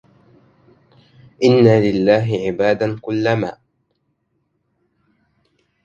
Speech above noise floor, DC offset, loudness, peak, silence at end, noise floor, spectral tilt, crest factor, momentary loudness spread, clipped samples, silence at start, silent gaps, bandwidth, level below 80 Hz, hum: 53 dB; under 0.1%; -16 LUFS; 0 dBFS; 2.35 s; -69 dBFS; -7.5 dB/octave; 18 dB; 9 LU; under 0.1%; 1.4 s; none; 7.6 kHz; -54 dBFS; none